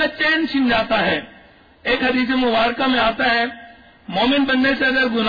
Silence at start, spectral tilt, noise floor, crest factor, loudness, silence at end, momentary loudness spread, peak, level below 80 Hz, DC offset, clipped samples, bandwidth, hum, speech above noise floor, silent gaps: 0 s; -6 dB/octave; -48 dBFS; 12 dB; -18 LUFS; 0 s; 5 LU; -6 dBFS; -46 dBFS; under 0.1%; under 0.1%; 5 kHz; none; 30 dB; none